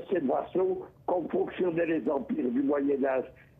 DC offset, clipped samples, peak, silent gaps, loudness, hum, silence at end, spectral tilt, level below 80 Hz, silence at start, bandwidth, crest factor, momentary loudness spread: under 0.1%; under 0.1%; -16 dBFS; none; -29 LUFS; none; 0.3 s; -9.5 dB/octave; -64 dBFS; 0 s; 3.8 kHz; 12 dB; 4 LU